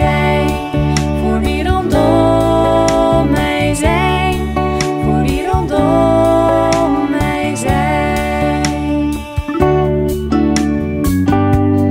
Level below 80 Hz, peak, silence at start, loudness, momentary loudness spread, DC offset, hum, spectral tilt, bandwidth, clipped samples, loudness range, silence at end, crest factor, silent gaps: -24 dBFS; 0 dBFS; 0 s; -14 LUFS; 5 LU; under 0.1%; none; -6.5 dB/octave; 16 kHz; under 0.1%; 2 LU; 0 s; 12 dB; none